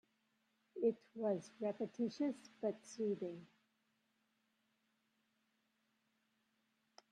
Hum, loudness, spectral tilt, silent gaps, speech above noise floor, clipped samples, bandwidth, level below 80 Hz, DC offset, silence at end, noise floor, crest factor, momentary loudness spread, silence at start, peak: none; -43 LUFS; -6.5 dB/octave; none; 41 dB; under 0.1%; 10.5 kHz; under -90 dBFS; under 0.1%; 3.65 s; -83 dBFS; 20 dB; 6 LU; 0.75 s; -26 dBFS